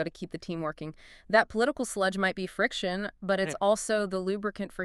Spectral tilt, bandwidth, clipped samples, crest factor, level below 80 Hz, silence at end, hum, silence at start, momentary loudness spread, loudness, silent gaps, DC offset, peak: -4 dB/octave; 13 kHz; under 0.1%; 22 dB; -58 dBFS; 0 s; none; 0 s; 10 LU; -29 LUFS; none; under 0.1%; -8 dBFS